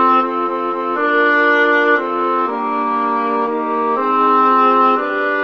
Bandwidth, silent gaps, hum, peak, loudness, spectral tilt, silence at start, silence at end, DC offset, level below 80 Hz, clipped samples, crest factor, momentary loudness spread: 6.6 kHz; none; none; -2 dBFS; -15 LUFS; -5 dB/octave; 0 s; 0 s; 0.3%; -70 dBFS; under 0.1%; 14 dB; 7 LU